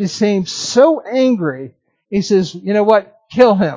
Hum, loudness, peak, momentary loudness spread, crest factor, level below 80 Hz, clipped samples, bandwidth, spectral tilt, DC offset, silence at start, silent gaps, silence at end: none; -15 LUFS; 0 dBFS; 10 LU; 14 dB; -56 dBFS; under 0.1%; 7.6 kHz; -5.5 dB/octave; under 0.1%; 0 s; none; 0 s